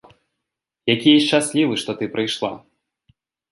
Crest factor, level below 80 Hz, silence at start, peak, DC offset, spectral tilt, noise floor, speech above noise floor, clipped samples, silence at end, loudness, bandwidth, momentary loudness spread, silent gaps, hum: 20 dB; -64 dBFS; 0.85 s; -2 dBFS; under 0.1%; -4 dB/octave; -82 dBFS; 64 dB; under 0.1%; 0.95 s; -19 LUFS; 11.5 kHz; 13 LU; none; none